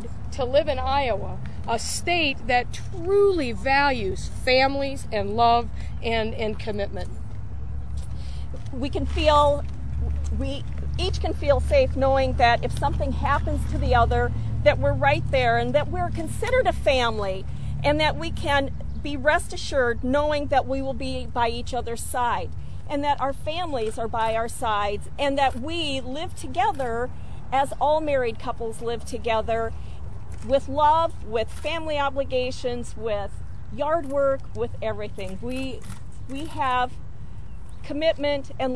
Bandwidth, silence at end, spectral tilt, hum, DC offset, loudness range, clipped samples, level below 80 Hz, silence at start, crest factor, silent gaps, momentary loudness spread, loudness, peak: 11 kHz; 0 s; -5.5 dB/octave; none; 3%; 6 LU; under 0.1%; -34 dBFS; 0 s; 20 dB; none; 14 LU; -25 LUFS; -4 dBFS